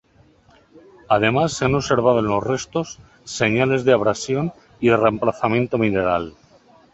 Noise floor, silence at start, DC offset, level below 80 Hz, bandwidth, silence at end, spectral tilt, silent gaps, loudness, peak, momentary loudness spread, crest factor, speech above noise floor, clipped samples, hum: -54 dBFS; 0.75 s; under 0.1%; -48 dBFS; 8.2 kHz; 0.65 s; -5.5 dB/octave; none; -19 LUFS; -2 dBFS; 10 LU; 20 dB; 35 dB; under 0.1%; none